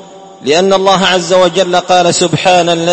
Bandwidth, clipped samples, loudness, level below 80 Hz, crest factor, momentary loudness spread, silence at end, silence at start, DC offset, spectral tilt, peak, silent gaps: 11 kHz; 0.3%; -9 LUFS; -50 dBFS; 10 dB; 3 LU; 0 s; 0 s; under 0.1%; -3.5 dB/octave; 0 dBFS; none